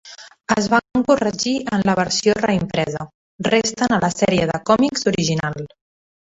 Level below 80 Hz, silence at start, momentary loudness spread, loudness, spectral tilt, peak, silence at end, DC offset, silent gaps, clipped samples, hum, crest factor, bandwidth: -50 dBFS; 0.05 s; 11 LU; -19 LUFS; -4.5 dB/octave; -2 dBFS; 0.75 s; under 0.1%; 3.14-3.39 s; under 0.1%; none; 18 dB; 8.4 kHz